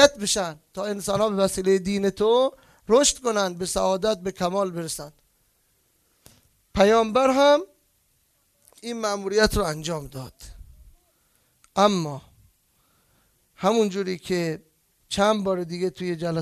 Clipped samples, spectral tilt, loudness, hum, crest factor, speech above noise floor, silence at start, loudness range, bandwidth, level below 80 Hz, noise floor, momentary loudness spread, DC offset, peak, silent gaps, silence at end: under 0.1%; -4 dB/octave; -23 LUFS; none; 22 dB; 44 dB; 0 s; 6 LU; 14 kHz; -48 dBFS; -67 dBFS; 14 LU; under 0.1%; -2 dBFS; none; 0 s